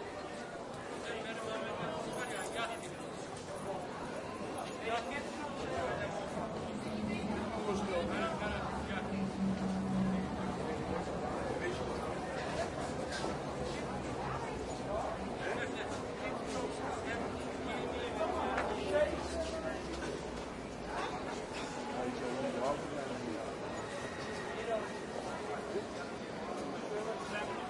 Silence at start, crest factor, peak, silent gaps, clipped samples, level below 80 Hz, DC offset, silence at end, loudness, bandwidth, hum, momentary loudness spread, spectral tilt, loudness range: 0 s; 18 dB; -20 dBFS; none; under 0.1%; -56 dBFS; under 0.1%; 0 s; -39 LUFS; 11.5 kHz; none; 6 LU; -5 dB/octave; 4 LU